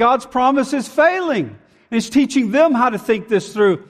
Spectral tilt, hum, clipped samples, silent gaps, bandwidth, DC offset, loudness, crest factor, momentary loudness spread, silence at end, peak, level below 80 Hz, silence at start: -5 dB/octave; none; under 0.1%; none; 14 kHz; under 0.1%; -17 LUFS; 14 dB; 8 LU; 0.1 s; -4 dBFS; -56 dBFS; 0 s